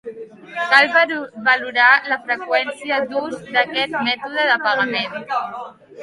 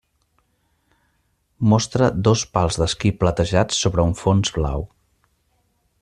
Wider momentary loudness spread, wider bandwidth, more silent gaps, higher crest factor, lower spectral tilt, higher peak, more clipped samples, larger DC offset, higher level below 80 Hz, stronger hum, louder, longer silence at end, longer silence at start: first, 15 LU vs 6 LU; about the same, 11.5 kHz vs 11 kHz; neither; about the same, 20 dB vs 18 dB; second, -3 dB/octave vs -5.5 dB/octave; about the same, 0 dBFS vs -2 dBFS; neither; neither; second, -66 dBFS vs -38 dBFS; neither; first, -17 LUFS vs -20 LUFS; second, 0 s vs 1.15 s; second, 0.05 s vs 1.6 s